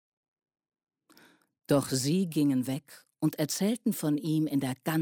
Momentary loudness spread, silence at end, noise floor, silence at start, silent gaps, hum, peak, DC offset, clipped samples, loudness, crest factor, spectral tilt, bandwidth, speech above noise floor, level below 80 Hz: 5 LU; 0 s; -61 dBFS; 1.7 s; none; none; -14 dBFS; under 0.1%; under 0.1%; -29 LUFS; 16 dB; -5.5 dB/octave; 17.5 kHz; 32 dB; -70 dBFS